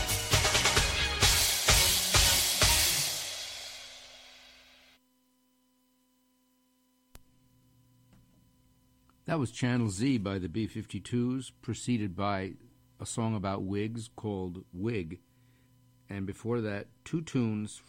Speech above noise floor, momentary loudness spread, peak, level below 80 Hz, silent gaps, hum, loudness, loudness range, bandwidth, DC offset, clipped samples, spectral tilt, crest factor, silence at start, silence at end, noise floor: 37 dB; 18 LU; -8 dBFS; -44 dBFS; none; 60 Hz at -60 dBFS; -28 LUFS; 14 LU; 16.5 kHz; under 0.1%; under 0.1%; -2.5 dB/octave; 24 dB; 0 s; 0.1 s; -70 dBFS